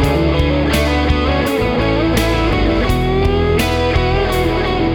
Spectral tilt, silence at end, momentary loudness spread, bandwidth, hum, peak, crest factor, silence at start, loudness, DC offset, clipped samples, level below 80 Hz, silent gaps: -6 dB/octave; 0 s; 1 LU; 19.5 kHz; none; -2 dBFS; 12 dB; 0 s; -15 LUFS; under 0.1%; under 0.1%; -20 dBFS; none